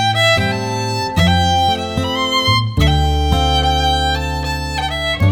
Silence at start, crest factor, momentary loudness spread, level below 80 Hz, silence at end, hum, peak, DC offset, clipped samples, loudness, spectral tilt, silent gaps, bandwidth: 0 s; 14 dB; 7 LU; -22 dBFS; 0 s; none; -2 dBFS; under 0.1%; under 0.1%; -15 LUFS; -4.5 dB/octave; none; 19 kHz